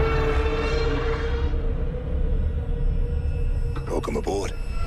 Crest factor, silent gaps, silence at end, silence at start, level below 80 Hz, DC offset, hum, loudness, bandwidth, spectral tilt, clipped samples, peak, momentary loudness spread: 14 dB; none; 0 s; 0 s; -24 dBFS; under 0.1%; none; -27 LUFS; 9.4 kHz; -6.5 dB/octave; under 0.1%; -10 dBFS; 5 LU